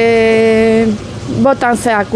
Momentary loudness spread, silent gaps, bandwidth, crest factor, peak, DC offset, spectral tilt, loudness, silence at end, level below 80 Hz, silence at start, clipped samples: 8 LU; none; 11 kHz; 10 dB; 0 dBFS; under 0.1%; -5.5 dB/octave; -11 LUFS; 0 s; -38 dBFS; 0 s; under 0.1%